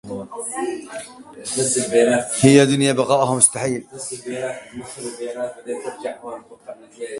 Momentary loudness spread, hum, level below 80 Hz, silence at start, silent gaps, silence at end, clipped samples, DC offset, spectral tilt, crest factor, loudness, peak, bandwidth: 21 LU; none; -58 dBFS; 0.05 s; none; 0 s; under 0.1%; under 0.1%; -4 dB/octave; 20 dB; -19 LUFS; 0 dBFS; 11.5 kHz